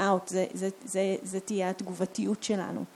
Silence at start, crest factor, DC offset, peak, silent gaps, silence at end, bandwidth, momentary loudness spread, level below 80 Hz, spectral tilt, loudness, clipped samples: 0 s; 18 dB; under 0.1%; -12 dBFS; none; 0 s; 14 kHz; 5 LU; -78 dBFS; -5 dB/octave; -31 LUFS; under 0.1%